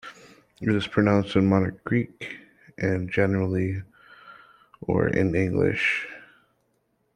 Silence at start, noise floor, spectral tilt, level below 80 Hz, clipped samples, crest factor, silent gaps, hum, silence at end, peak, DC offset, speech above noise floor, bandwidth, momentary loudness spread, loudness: 0.05 s; -71 dBFS; -7.5 dB/octave; -54 dBFS; under 0.1%; 22 dB; none; none; 0.9 s; -4 dBFS; under 0.1%; 47 dB; 10 kHz; 16 LU; -24 LUFS